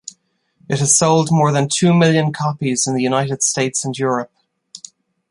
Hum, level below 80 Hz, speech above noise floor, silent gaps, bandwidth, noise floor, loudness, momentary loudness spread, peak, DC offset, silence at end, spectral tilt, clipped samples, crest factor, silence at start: none; -58 dBFS; 44 dB; none; 11.5 kHz; -60 dBFS; -16 LUFS; 19 LU; 0 dBFS; under 0.1%; 0.55 s; -4.5 dB/octave; under 0.1%; 16 dB; 0.05 s